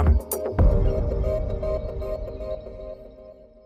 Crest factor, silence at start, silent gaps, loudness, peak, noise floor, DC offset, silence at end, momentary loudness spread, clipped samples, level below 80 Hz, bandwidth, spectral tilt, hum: 14 dB; 0 s; none; -26 LUFS; -10 dBFS; -46 dBFS; under 0.1%; 0.3 s; 18 LU; under 0.1%; -26 dBFS; 15.5 kHz; -7.5 dB/octave; none